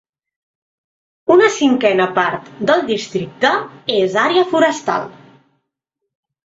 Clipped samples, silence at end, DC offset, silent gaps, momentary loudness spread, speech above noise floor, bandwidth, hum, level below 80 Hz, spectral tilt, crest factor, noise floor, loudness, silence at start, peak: under 0.1%; 1.35 s; under 0.1%; none; 9 LU; 62 dB; 8 kHz; none; -62 dBFS; -4 dB/octave; 16 dB; -78 dBFS; -16 LUFS; 1.3 s; 0 dBFS